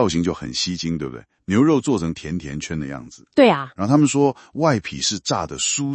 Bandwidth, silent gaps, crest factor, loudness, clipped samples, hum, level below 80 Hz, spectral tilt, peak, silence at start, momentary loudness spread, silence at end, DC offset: 8.8 kHz; none; 18 dB; -20 LUFS; under 0.1%; none; -50 dBFS; -4.5 dB/octave; -2 dBFS; 0 s; 12 LU; 0 s; under 0.1%